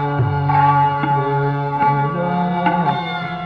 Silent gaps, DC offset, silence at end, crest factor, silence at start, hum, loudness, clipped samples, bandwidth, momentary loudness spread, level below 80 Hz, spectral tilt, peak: none; under 0.1%; 0 s; 12 dB; 0 s; none; -17 LUFS; under 0.1%; 5.2 kHz; 5 LU; -48 dBFS; -9 dB/octave; -4 dBFS